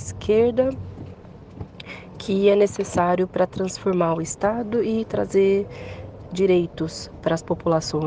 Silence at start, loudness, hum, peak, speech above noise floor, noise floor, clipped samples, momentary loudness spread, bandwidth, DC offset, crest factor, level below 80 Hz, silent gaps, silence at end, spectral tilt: 0 s; -22 LUFS; none; -6 dBFS; 20 dB; -41 dBFS; under 0.1%; 19 LU; 9.8 kHz; under 0.1%; 16 dB; -48 dBFS; none; 0 s; -6 dB/octave